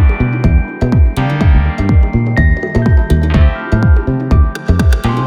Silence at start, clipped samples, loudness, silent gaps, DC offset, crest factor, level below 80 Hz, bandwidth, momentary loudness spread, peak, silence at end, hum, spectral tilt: 0 s; under 0.1%; -12 LUFS; none; under 0.1%; 10 dB; -14 dBFS; 10 kHz; 2 LU; 0 dBFS; 0 s; none; -8 dB/octave